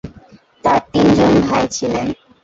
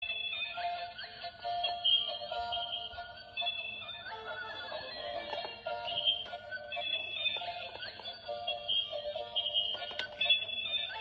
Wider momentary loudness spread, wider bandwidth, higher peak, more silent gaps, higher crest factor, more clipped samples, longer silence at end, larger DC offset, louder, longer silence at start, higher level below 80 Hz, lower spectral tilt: second, 9 LU vs 13 LU; about the same, 8 kHz vs 7.6 kHz; first, -2 dBFS vs -16 dBFS; neither; second, 14 dB vs 20 dB; neither; first, 0.3 s vs 0 s; neither; first, -15 LUFS vs -34 LUFS; about the same, 0.05 s vs 0 s; first, -40 dBFS vs -68 dBFS; first, -5.5 dB/octave vs -3 dB/octave